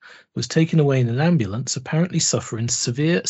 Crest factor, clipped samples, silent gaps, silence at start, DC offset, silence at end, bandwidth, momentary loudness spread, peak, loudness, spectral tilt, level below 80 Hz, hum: 16 dB; under 0.1%; none; 0.05 s; under 0.1%; 0 s; 8.2 kHz; 7 LU; -4 dBFS; -20 LUFS; -5 dB/octave; -58 dBFS; none